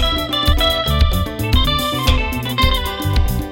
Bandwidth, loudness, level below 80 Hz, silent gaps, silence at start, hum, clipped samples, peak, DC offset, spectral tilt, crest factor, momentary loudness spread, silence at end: 16.5 kHz; -17 LUFS; -20 dBFS; none; 0 s; none; under 0.1%; -2 dBFS; under 0.1%; -4.5 dB/octave; 14 dB; 4 LU; 0 s